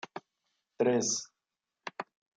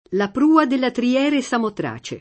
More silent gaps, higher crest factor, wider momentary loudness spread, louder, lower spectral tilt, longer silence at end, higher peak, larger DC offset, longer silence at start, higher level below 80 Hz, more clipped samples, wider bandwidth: neither; about the same, 20 dB vs 18 dB; first, 20 LU vs 10 LU; second, -31 LUFS vs -19 LUFS; second, -3 dB/octave vs -5 dB/octave; first, 0.35 s vs 0 s; second, -16 dBFS vs -2 dBFS; neither; about the same, 0.15 s vs 0.1 s; second, -80 dBFS vs -58 dBFS; neither; first, 10 kHz vs 8.8 kHz